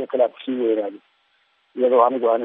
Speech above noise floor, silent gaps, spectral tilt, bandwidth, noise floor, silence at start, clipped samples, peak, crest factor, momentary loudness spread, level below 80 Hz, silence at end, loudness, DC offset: 44 dB; none; -3.5 dB/octave; 3.9 kHz; -64 dBFS; 0 s; under 0.1%; -2 dBFS; 18 dB; 12 LU; -88 dBFS; 0 s; -20 LUFS; under 0.1%